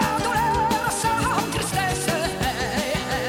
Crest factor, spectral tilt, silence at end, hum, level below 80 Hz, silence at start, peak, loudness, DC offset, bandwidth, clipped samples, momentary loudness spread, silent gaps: 14 dB; -3.5 dB/octave; 0 s; none; -38 dBFS; 0 s; -8 dBFS; -23 LUFS; under 0.1%; 17 kHz; under 0.1%; 3 LU; none